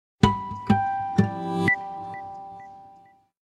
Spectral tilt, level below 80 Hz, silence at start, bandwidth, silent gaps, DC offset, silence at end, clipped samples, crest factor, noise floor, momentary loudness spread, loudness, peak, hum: -7 dB/octave; -46 dBFS; 0.2 s; 12 kHz; none; under 0.1%; 0.45 s; under 0.1%; 26 dB; -55 dBFS; 18 LU; -25 LUFS; 0 dBFS; none